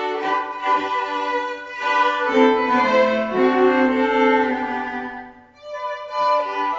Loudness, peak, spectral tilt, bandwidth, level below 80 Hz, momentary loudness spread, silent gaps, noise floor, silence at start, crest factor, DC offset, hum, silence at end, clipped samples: -19 LUFS; -4 dBFS; -4.5 dB/octave; 7.8 kHz; -60 dBFS; 12 LU; none; -40 dBFS; 0 s; 16 dB; under 0.1%; none; 0 s; under 0.1%